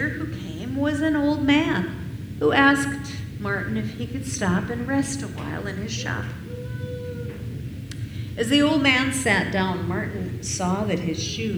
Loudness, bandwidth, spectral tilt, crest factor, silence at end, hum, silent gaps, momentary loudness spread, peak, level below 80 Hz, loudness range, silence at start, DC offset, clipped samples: -24 LUFS; over 20 kHz; -4.5 dB/octave; 22 dB; 0 s; none; none; 15 LU; -2 dBFS; -44 dBFS; 7 LU; 0 s; under 0.1%; under 0.1%